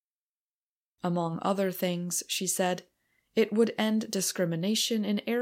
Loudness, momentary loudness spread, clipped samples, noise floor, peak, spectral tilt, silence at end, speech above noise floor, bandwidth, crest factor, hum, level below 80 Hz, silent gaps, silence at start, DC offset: -29 LUFS; 5 LU; under 0.1%; under -90 dBFS; -12 dBFS; -4 dB/octave; 0 s; over 61 dB; 16.5 kHz; 18 dB; none; -78 dBFS; none; 1.05 s; under 0.1%